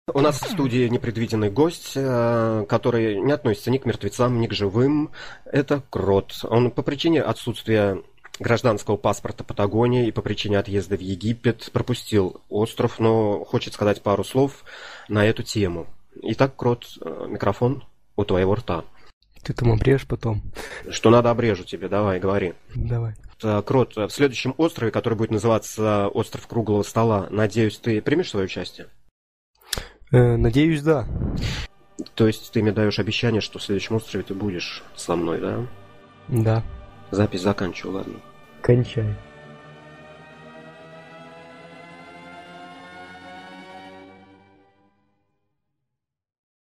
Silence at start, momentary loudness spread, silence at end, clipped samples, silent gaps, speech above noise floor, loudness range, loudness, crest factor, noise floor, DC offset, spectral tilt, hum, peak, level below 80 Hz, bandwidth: 0.1 s; 20 LU; 2.3 s; under 0.1%; 19.13-19.21 s, 29.11-29.54 s; 61 dB; 6 LU; -23 LUFS; 20 dB; -83 dBFS; under 0.1%; -6.5 dB/octave; none; -2 dBFS; -42 dBFS; 15.5 kHz